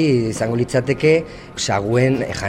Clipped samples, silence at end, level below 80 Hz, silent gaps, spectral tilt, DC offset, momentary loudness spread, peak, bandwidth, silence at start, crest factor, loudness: under 0.1%; 0 s; -44 dBFS; none; -5.5 dB/octave; under 0.1%; 5 LU; -2 dBFS; 13 kHz; 0 s; 14 dB; -18 LUFS